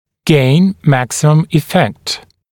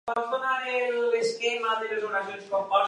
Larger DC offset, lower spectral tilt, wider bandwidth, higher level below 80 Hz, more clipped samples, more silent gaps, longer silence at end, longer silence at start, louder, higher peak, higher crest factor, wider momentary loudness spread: neither; first, -6 dB/octave vs -2 dB/octave; first, 17.5 kHz vs 11 kHz; first, -46 dBFS vs -80 dBFS; neither; neither; first, 0.35 s vs 0 s; first, 0.25 s vs 0.05 s; first, -13 LUFS vs -27 LUFS; first, 0 dBFS vs -10 dBFS; second, 12 dB vs 18 dB; first, 10 LU vs 5 LU